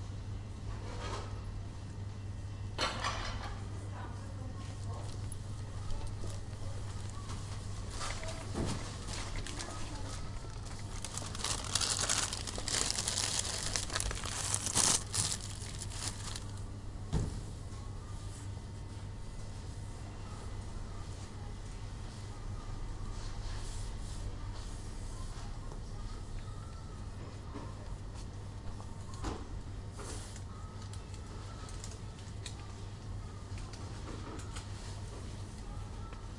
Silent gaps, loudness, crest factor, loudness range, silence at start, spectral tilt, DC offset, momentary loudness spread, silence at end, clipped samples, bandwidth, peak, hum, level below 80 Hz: none; -40 LUFS; 32 dB; 13 LU; 0 s; -3 dB/octave; under 0.1%; 13 LU; 0 s; under 0.1%; 11.5 kHz; -8 dBFS; none; -46 dBFS